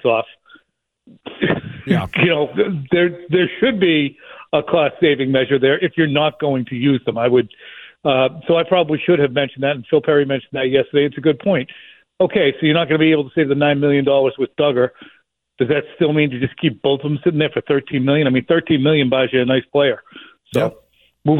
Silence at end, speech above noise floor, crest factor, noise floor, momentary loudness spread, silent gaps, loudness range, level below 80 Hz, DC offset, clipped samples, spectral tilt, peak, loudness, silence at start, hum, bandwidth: 0 s; 47 dB; 14 dB; -63 dBFS; 6 LU; none; 2 LU; -54 dBFS; under 0.1%; under 0.1%; -8 dB/octave; -2 dBFS; -17 LUFS; 0.05 s; none; 11.5 kHz